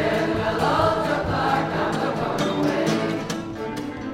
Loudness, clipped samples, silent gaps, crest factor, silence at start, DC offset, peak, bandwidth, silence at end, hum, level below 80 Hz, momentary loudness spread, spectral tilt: -23 LUFS; under 0.1%; none; 16 dB; 0 s; under 0.1%; -6 dBFS; 16.5 kHz; 0 s; none; -46 dBFS; 9 LU; -5.5 dB/octave